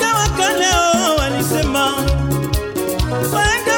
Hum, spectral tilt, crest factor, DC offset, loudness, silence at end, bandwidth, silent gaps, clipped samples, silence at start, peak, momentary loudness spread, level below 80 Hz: none; -3.5 dB/octave; 12 dB; under 0.1%; -16 LUFS; 0 s; 18 kHz; none; under 0.1%; 0 s; -4 dBFS; 6 LU; -26 dBFS